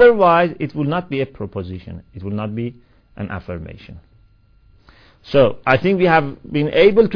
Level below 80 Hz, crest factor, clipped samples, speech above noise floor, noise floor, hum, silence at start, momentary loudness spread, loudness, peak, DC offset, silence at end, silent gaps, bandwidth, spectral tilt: -44 dBFS; 18 dB; under 0.1%; 35 dB; -52 dBFS; none; 0 s; 18 LU; -17 LUFS; 0 dBFS; under 0.1%; 0 s; none; 5.4 kHz; -8.5 dB/octave